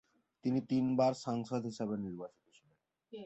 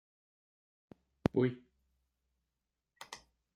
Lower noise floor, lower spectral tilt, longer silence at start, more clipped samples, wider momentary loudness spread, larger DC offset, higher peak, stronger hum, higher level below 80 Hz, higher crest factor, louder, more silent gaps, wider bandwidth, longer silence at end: second, -77 dBFS vs -88 dBFS; about the same, -7 dB/octave vs -7 dB/octave; second, 0.45 s vs 1.35 s; neither; second, 16 LU vs 21 LU; neither; second, -20 dBFS vs -12 dBFS; neither; second, -74 dBFS vs -66 dBFS; second, 18 dB vs 30 dB; about the same, -36 LUFS vs -35 LUFS; neither; second, 8.2 kHz vs 14.5 kHz; second, 0 s vs 0.4 s